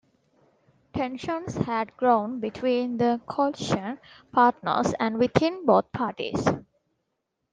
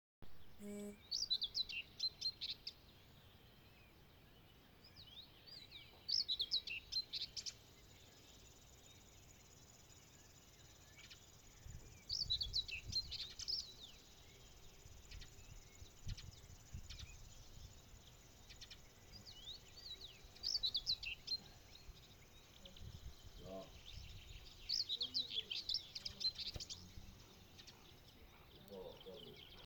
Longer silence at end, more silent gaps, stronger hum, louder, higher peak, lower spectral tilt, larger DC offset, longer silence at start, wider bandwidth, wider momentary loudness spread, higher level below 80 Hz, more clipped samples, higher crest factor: first, 0.9 s vs 0 s; neither; neither; first, -25 LUFS vs -43 LUFS; first, -4 dBFS vs -28 dBFS; first, -6 dB/octave vs -2 dB/octave; neither; first, 0.95 s vs 0.2 s; second, 9.6 kHz vs 19 kHz; second, 10 LU vs 23 LU; first, -58 dBFS vs -64 dBFS; neither; about the same, 22 dB vs 22 dB